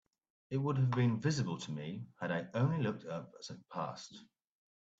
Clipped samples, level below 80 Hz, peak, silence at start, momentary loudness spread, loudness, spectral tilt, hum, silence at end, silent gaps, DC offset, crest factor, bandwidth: under 0.1%; -72 dBFS; -20 dBFS; 0.5 s; 14 LU; -37 LUFS; -6.5 dB/octave; none; 0.75 s; none; under 0.1%; 16 dB; 8 kHz